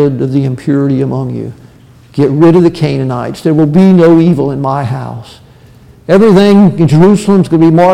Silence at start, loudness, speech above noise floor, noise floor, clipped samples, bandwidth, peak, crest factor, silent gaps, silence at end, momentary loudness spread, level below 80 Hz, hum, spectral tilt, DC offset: 0 s; -8 LUFS; 31 dB; -38 dBFS; under 0.1%; 11.5 kHz; 0 dBFS; 8 dB; none; 0 s; 14 LU; -42 dBFS; none; -8.5 dB/octave; under 0.1%